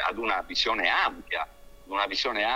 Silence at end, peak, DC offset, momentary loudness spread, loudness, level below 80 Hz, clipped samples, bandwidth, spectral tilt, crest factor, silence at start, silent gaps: 0 s; -10 dBFS; under 0.1%; 9 LU; -27 LUFS; -54 dBFS; under 0.1%; 16 kHz; -1.5 dB/octave; 18 dB; 0 s; none